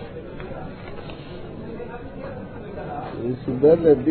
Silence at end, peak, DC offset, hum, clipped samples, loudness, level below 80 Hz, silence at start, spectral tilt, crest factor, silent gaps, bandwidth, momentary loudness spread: 0 s; -4 dBFS; under 0.1%; none; under 0.1%; -23 LUFS; -44 dBFS; 0 s; -12 dB/octave; 20 dB; none; 4.5 kHz; 20 LU